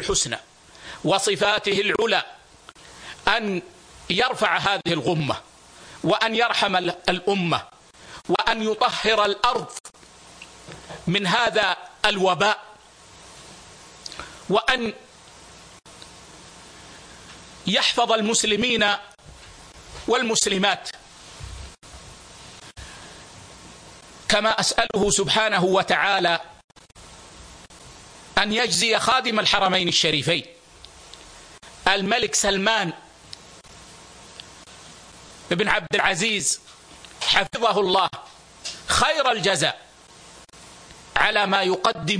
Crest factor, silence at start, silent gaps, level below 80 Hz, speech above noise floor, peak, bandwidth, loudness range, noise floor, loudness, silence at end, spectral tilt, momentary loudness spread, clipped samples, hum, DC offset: 22 dB; 0 s; 9.80-9.84 s, 26.64-26.68 s; -50 dBFS; 27 dB; -4 dBFS; 10.5 kHz; 8 LU; -48 dBFS; -21 LUFS; 0 s; -2.5 dB/octave; 24 LU; under 0.1%; none; under 0.1%